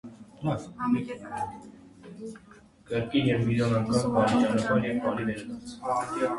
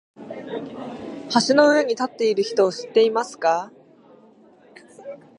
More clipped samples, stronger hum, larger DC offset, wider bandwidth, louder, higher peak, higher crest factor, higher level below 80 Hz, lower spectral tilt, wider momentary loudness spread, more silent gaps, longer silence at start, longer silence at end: neither; neither; neither; about the same, 11.5 kHz vs 11 kHz; second, -28 LUFS vs -20 LUFS; second, -10 dBFS vs -2 dBFS; about the same, 18 dB vs 20 dB; first, -56 dBFS vs -72 dBFS; first, -6.5 dB/octave vs -3.5 dB/octave; second, 18 LU vs 22 LU; neither; second, 0.05 s vs 0.2 s; second, 0 s vs 0.2 s